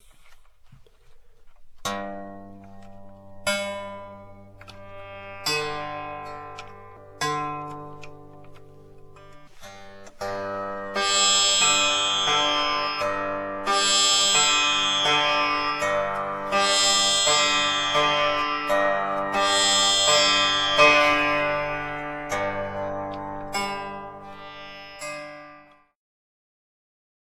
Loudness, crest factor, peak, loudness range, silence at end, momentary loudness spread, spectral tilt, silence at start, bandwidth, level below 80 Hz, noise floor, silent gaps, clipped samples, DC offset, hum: -21 LUFS; 22 dB; -4 dBFS; 16 LU; 1.65 s; 21 LU; -0.5 dB/octave; 0.2 s; 16.5 kHz; -52 dBFS; -51 dBFS; none; under 0.1%; under 0.1%; none